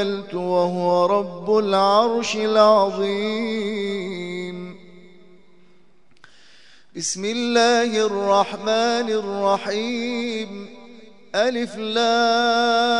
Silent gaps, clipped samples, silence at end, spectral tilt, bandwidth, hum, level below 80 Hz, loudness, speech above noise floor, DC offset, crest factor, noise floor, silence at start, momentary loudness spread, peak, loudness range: none; under 0.1%; 0 s; -4 dB/octave; 11 kHz; none; -70 dBFS; -20 LUFS; 39 dB; 0.4%; 18 dB; -59 dBFS; 0 s; 12 LU; -2 dBFS; 12 LU